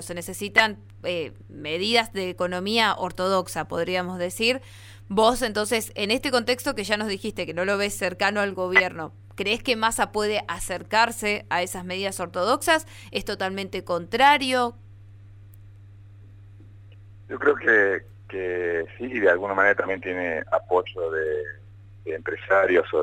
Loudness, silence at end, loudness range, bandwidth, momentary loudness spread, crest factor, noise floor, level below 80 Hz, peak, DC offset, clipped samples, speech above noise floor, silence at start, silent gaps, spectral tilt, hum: -24 LUFS; 0 s; 2 LU; 17 kHz; 11 LU; 20 dB; -46 dBFS; -52 dBFS; -6 dBFS; under 0.1%; under 0.1%; 22 dB; 0 s; none; -3.5 dB/octave; none